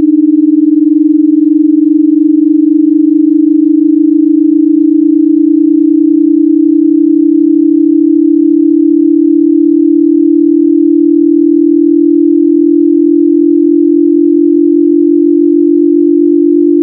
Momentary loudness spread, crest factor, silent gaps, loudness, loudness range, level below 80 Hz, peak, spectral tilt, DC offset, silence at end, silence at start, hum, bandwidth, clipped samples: 0 LU; 6 dB; none; -7 LUFS; 0 LU; -64 dBFS; 0 dBFS; -12.5 dB/octave; under 0.1%; 0 s; 0 s; none; 0.4 kHz; under 0.1%